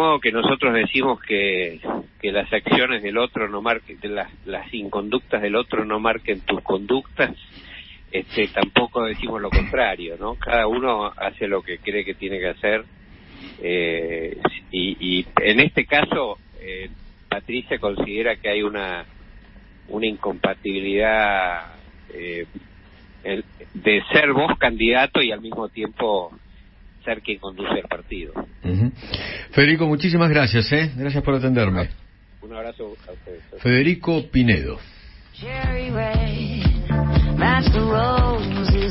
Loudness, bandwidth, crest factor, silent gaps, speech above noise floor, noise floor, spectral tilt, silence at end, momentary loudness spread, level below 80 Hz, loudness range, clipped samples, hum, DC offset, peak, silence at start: -21 LUFS; 5.8 kHz; 22 dB; none; 25 dB; -46 dBFS; -10.5 dB/octave; 0 s; 16 LU; -32 dBFS; 6 LU; under 0.1%; none; under 0.1%; 0 dBFS; 0 s